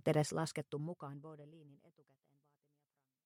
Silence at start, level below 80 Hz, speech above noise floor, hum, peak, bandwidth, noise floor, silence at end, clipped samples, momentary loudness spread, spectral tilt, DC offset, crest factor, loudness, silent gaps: 0.05 s; -82 dBFS; 47 dB; none; -20 dBFS; 16 kHz; -88 dBFS; 1.5 s; under 0.1%; 23 LU; -6 dB/octave; under 0.1%; 22 dB; -40 LUFS; none